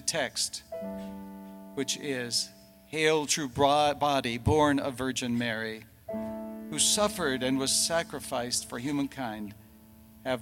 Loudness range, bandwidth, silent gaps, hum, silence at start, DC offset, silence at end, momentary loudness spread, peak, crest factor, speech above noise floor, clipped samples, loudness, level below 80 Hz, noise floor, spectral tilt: 4 LU; 17.5 kHz; none; none; 0 s; under 0.1%; 0 s; 15 LU; -10 dBFS; 20 dB; 25 dB; under 0.1%; -29 LUFS; -56 dBFS; -54 dBFS; -3 dB/octave